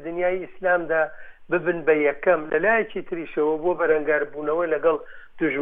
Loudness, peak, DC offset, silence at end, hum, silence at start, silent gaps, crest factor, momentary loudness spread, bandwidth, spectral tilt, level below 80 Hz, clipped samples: -23 LUFS; -6 dBFS; under 0.1%; 0 s; none; 0 s; none; 16 dB; 7 LU; 3.7 kHz; -9 dB/octave; -54 dBFS; under 0.1%